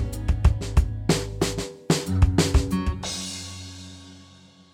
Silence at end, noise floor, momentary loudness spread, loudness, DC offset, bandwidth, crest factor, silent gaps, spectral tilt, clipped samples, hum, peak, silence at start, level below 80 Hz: 0.5 s; -51 dBFS; 17 LU; -24 LUFS; under 0.1%; 16.5 kHz; 20 dB; none; -5 dB/octave; under 0.1%; none; -6 dBFS; 0 s; -28 dBFS